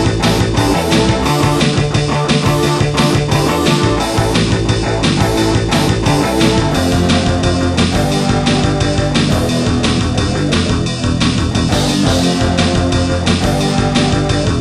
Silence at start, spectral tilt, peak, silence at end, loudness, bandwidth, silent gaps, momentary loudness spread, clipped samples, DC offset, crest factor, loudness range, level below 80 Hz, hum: 0 s; -5 dB/octave; 0 dBFS; 0 s; -13 LUFS; 13 kHz; none; 2 LU; under 0.1%; under 0.1%; 12 dB; 1 LU; -26 dBFS; none